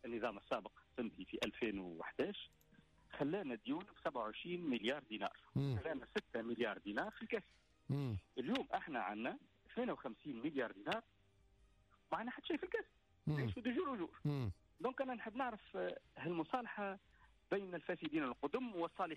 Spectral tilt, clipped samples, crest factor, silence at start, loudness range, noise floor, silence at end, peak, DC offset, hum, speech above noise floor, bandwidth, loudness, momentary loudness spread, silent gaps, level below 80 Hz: -7 dB/octave; under 0.1%; 14 dB; 0.05 s; 2 LU; -72 dBFS; 0 s; -30 dBFS; under 0.1%; none; 29 dB; 13 kHz; -44 LUFS; 6 LU; none; -70 dBFS